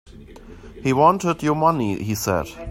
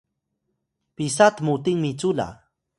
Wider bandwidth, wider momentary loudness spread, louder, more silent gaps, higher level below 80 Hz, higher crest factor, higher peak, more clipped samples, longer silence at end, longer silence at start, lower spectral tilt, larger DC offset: first, 16 kHz vs 11.5 kHz; second, 8 LU vs 11 LU; about the same, -20 LUFS vs -22 LUFS; neither; first, -46 dBFS vs -58 dBFS; about the same, 20 dB vs 22 dB; about the same, -2 dBFS vs -2 dBFS; neither; second, 0 s vs 0.45 s; second, 0.15 s vs 1 s; about the same, -6 dB/octave vs -5 dB/octave; neither